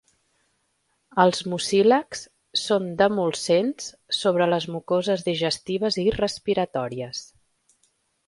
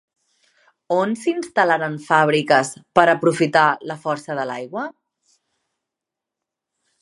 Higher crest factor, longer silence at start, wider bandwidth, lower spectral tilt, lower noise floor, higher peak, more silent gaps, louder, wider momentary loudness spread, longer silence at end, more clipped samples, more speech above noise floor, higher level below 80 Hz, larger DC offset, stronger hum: about the same, 22 dB vs 22 dB; first, 1.15 s vs 0.9 s; about the same, 11.5 kHz vs 11.5 kHz; about the same, -4.5 dB/octave vs -5 dB/octave; second, -71 dBFS vs -85 dBFS; second, -4 dBFS vs 0 dBFS; neither; second, -23 LUFS vs -19 LUFS; about the same, 10 LU vs 11 LU; second, 1.05 s vs 2.1 s; neither; second, 48 dB vs 66 dB; first, -56 dBFS vs -68 dBFS; neither; neither